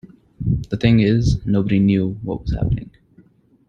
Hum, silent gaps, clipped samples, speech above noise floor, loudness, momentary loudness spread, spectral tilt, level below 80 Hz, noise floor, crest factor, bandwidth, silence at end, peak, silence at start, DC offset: none; none; under 0.1%; 35 dB; -19 LUFS; 10 LU; -8 dB/octave; -32 dBFS; -52 dBFS; 18 dB; 7.6 kHz; 0.85 s; -2 dBFS; 0.4 s; under 0.1%